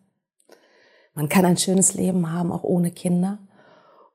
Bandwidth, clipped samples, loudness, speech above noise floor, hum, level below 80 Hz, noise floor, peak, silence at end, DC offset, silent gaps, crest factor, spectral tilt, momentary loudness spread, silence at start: 16 kHz; under 0.1%; -21 LUFS; 43 dB; none; -64 dBFS; -63 dBFS; -6 dBFS; 0.75 s; under 0.1%; none; 18 dB; -5 dB/octave; 11 LU; 1.15 s